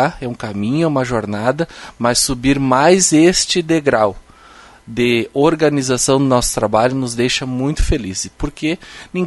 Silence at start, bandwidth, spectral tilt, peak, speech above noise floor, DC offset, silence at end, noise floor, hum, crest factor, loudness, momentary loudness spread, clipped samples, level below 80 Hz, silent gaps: 0 s; 12 kHz; -4 dB/octave; 0 dBFS; 27 dB; under 0.1%; 0 s; -42 dBFS; none; 16 dB; -15 LUFS; 11 LU; under 0.1%; -30 dBFS; none